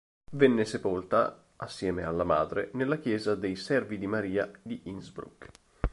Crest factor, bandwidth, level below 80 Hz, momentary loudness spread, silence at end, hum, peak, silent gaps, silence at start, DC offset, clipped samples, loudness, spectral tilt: 22 dB; 11.5 kHz; -46 dBFS; 16 LU; 0.05 s; none; -8 dBFS; none; 0.3 s; under 0.1%; under 0.1%; -30 LUFS; -6.5 dB/octave